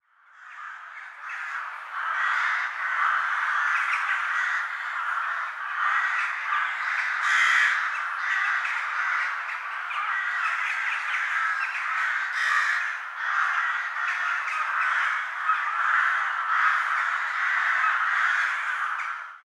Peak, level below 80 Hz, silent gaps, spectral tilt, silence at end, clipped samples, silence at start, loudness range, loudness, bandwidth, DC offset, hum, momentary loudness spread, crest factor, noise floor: -10 dBFS; under -90 dBFS; none; 5.5 dB/octave; 0.05 s; under 0.1%; 0.35 s; 3 LU; -25 LUFS; 14 kHz; under 0.1%; none; 8 LU; 16 dB; -51 dBFS